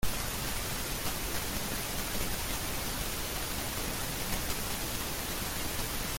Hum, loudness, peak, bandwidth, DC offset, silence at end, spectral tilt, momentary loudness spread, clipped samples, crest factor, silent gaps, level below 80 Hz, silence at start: none; -34 LUFS; -16 dBFS; 17 kHz; under 0.1%; 0 s; -2.5 dB/octave; 1 LU; under 0.1%; 18 dB; none; -42 dBFS; 0 s